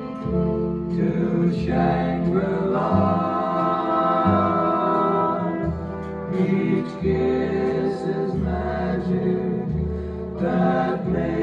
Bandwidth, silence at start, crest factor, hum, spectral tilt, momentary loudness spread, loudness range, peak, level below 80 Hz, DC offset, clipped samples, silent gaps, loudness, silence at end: 7 kHz; 0 s; 16 dB; none; -9.5 dB/octave; 6 LU; 3 LU; -6 dBFS; -40 dBFS; under 0.1%; under 0.1%; none; -22 LUFS; 0 s